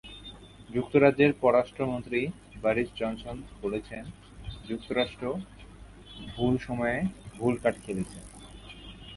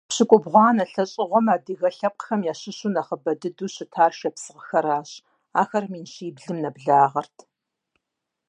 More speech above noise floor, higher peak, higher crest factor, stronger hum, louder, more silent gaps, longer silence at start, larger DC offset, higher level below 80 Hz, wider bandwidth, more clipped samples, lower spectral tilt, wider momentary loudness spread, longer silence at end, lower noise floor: second, 20 dB vs 61 dB; second, -8 dBFS vs -2 dBFS; about the same, 22 dB vs 22 dB; neither; second, -29 LUFS vs -22 LUFS; neither; about the same, 0.05 s vs 0.1 s; neither; first, -50 dBFS vs -78 dBFS; first, 11.5 kHz vs 10 kHz; neither; first, -6.5 dB/octave vs -5 dB/octave; first, 23 LU vs 14 LU; second, 0 s vs 1.25 s; second, -48 dBFS vs -83 dBFS